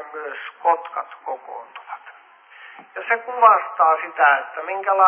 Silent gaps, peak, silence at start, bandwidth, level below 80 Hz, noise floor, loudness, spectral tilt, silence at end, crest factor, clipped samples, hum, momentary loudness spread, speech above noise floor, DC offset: none; -2 dBFS; 0 s; 3.5 kHz; under -90 dBFS; -48 dBFS; -19 LUFS; -4 dB/octave; 0 s; 20 dB; under 0.1%; none; 22 LU; 28 dB; under 0.1%